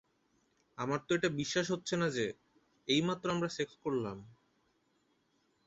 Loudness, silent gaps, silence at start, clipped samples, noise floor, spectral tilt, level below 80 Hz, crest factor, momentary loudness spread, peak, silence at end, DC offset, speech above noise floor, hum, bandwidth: -35 LUFS; none; 0.8 s; under 0.1%; -75 dBFS; -4 dB/octave; -70 dBFS; 20 dB; 13 LU; -18 dBFS; 1.35 s; under 0.1%; 41 dB; none; 8 kHz